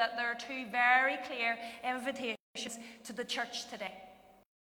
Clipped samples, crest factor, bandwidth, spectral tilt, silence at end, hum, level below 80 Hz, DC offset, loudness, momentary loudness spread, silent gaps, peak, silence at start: under 0.1%; 22 dB; over 20 kHz; -1.5 dB/octave; 0.5 s; none; -78 dBFS; under 0.1%; -34 LUFS; 16 LU; 2.40-2.54 s; -14 dBFS; 0 s